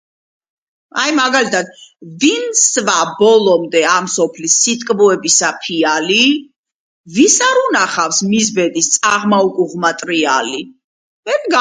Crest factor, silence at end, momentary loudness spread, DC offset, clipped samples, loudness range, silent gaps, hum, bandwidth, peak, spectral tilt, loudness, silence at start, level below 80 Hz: 14 dB; 0 s; 7 LU; under 0.1%; under 0.1%; 2 LU; 6.58-6.64 s, 6.74-7.04 s, 10.84-11.23 s; none; 10 kHz; 0 dBFS; -2 dB/octave; -13 LUFS; 0.95 s; -62 dBFS